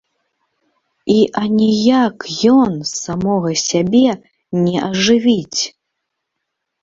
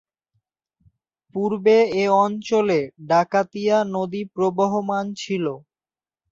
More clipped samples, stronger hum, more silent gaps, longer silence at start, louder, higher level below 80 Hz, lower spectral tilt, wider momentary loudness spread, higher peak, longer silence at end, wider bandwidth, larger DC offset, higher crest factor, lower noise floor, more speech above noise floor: neither; neither; neither; second, 1.05 s vs 1.35 s; first, -15 LUFS vs -21 LUFS; first, -52 dBFS vs -66 dBFS; second, -4.5 dB/octave vs -6 dB/octave; about the same, 9 LU vs 9 LU; first, -2 dBFS vs -6 dBFS; first, 1.15 s vs 0.75 s; about the same, 7.8 kHz vs 7.6 kHz; neither; about the same, 14 dB vs 16 dB; second, -76 dBFS vs under -90 dBFS; second, 62 dB vs over 70 dB